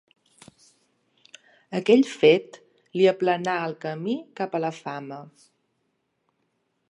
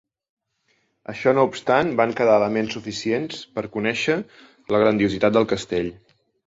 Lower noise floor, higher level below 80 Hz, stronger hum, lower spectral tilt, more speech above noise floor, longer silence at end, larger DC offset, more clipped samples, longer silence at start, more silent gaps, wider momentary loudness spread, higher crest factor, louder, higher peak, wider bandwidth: first, -74 dBFS vs -68 dBFS; second, -80 dBFS vs -54 dBFS; neither; about the same, -6 dB/octave vs -5.5 dB/octave; first, 51 dB vs 47 dB; first, 1.65 s vs 0.5 s; neither; neither; first, 1.7 s vs 1.1 s; neither; first, 16 LU vs 12 LU; about the same, 22 dB vs 20 dB; about the same, -23 LUFS vs -21 LUFS; about the same, -4 dBFS vs -2 dBFS; first, 11 kHz vs 8 kHz